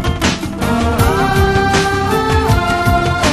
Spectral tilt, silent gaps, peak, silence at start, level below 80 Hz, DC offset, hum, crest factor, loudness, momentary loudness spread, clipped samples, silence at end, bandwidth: -5 dB/octave; none; 0 dBFS; 0 s; -22 dBFS; under 0.1%; none; 14 dB; -14 LUFS; 4 LU; under 0.1%; 0 s; 15.5 kHz